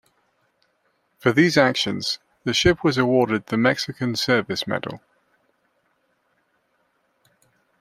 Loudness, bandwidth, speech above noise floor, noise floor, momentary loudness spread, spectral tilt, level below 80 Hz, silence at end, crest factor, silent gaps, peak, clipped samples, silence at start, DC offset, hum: -21 LUFS; 15.5 kHz; 48 dB; -68 dBFS; 10 LU; -4.5 dB/octave; -52 dBFS; 2.85 s; 22 dB; none; -2 dBFS; under 0.1%; 1.25 s; under 0.1%; none